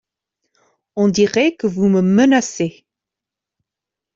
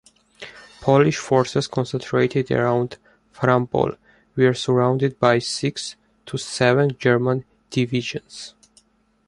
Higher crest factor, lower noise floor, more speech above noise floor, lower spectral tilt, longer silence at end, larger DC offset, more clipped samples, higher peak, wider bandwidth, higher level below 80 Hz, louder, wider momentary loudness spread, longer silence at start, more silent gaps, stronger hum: about the same, 16 dB vs 20 dB; first, -85 dBFS vs -59 dBFS; first, 71 dB vs 39 dB; about the same, -5.5 dB/octave vs -6 dB/octave; first, 1.45 s vs 0.8 s; neither; neither; about the same, -2 dBFS vs -2 dBFS; second, 7.8 kHz vs 11.5 kHz; about the same, -58 dBFS vs -56 dBFS; first, -16 LUFS vs -21 LUFS; second, 11 LU vs 15 LU; first, 0.95 s vs 0.4 s; neither; neither